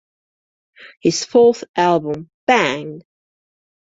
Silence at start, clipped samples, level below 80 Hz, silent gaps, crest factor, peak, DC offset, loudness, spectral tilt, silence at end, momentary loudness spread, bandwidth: 0.8 s; under 0.1%; -60 dBFS; 0.97-1.01 s, 1.69-1.74 s, 2.34-2.47 s; 18 dB; -2 dBFS; under 0.1%; -17 LUFS; -4 dB/octave; 1 s; 13 LU; 7.8 kHz